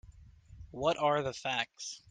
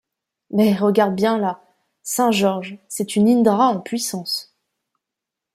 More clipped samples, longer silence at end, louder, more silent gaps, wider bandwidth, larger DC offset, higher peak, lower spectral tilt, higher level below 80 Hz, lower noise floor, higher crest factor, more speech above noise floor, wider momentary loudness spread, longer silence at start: neither; second, 0.15 s vs 1.1 s; second, -33 LUFS vs -19 LUFS; neither; second, 10 kHz vs 16 kHz; neither; second, -14 dBFS vs -2 dBFS; second, -3.5 dB/octave vs -5 dB/octave; first, -60 dBFS vs -66 dBFS; second, -56 dBFS vs -84 dBFS; about the same, 20 dB vs 18 dB; second, 22 dB vs 66 dB; about the same, 12 LU vs 12 LU; second, 0.05 s vs 0.5 s